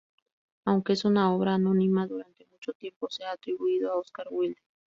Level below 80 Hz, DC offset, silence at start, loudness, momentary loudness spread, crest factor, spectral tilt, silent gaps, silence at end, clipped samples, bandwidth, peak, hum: -70 dBFS; under 0.1%; 0.65 s; -28 LUFS; 15 LU; 16 dB; -7.5 dB/octave; 2.75-2.80 s, 2.96-3.01 s; 0.35 s; under 0.1%; 7.6 kHz; -12 dBFS; none